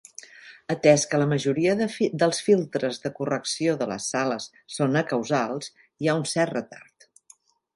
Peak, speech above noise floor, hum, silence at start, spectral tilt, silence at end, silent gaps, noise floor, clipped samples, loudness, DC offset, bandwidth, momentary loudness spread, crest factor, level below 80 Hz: -4 dBFS; 34 dB; none; 0.45 s; -5 dB/octave; 0.95 s; none; -58 dBFS; under 0.1%; -24 LUFS; under 0.1%; 11.5 kHz; 15 LU; 22 dB; -68 dBFS